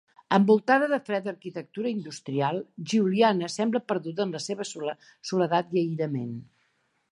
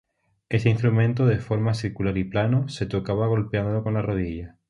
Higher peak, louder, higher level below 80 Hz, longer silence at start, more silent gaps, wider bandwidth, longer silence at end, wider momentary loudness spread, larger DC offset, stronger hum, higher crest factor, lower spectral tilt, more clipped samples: about the same, -6 dBFS vs -6 dBFS; second, -27 LUFS vs -24 LUFS; second, -76 dBFS vs -46 dBFS; second, 0.3 s vs 0.5 s; neither; about the same, 11 kHz vs 10.5 kHz; first, 0.7 s vs 0.2 s; first, 14 LU vs 7 LU; neither; neither; about the same, 20 dB vs 18 dB; second, -5.5 dB/octave vs -8 dB/octave; neither